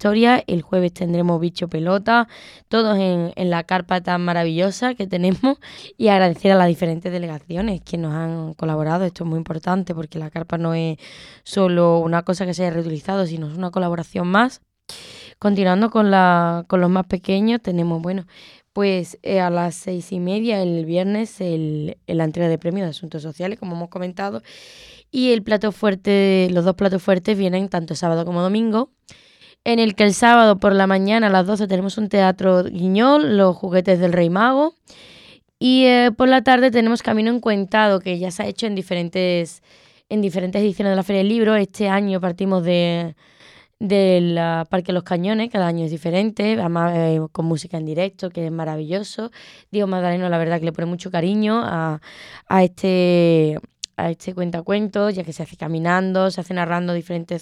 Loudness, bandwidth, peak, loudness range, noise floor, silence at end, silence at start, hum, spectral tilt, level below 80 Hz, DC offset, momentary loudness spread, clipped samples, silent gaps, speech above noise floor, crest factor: -19 LUFS; 12 kHz; 0 dBFS; 7 LU; -48 dBFS; 0 s; 0 s; none; -6.5 dB/octave; -54 dBFS; under 0.1%; 12 LU; under 0.1%; none; 29 dB; 18 dB